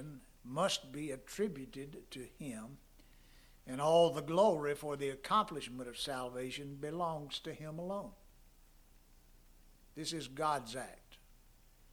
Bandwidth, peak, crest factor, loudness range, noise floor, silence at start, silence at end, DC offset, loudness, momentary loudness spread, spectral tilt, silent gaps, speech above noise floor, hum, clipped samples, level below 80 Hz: over 20 kHz; -18 dBFS; 22 dB; 10 LU; -63 dBFS; 0 s; 0.4 s; under 0.1%; -37 LUFS; 18 LU; -4.5 dB/octave; none; 26 dB; none; under 0.1%; -64 dBFS